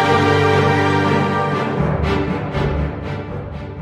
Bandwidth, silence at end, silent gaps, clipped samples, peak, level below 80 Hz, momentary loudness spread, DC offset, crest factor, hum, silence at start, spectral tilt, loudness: 12 kHz; 0 s; none; under 0.1%; -2 dBFS; -32 dBFS; 12 LU; under 0.1%; 16 dB; none; 0 s; -7 dB/octave; -17 LUFS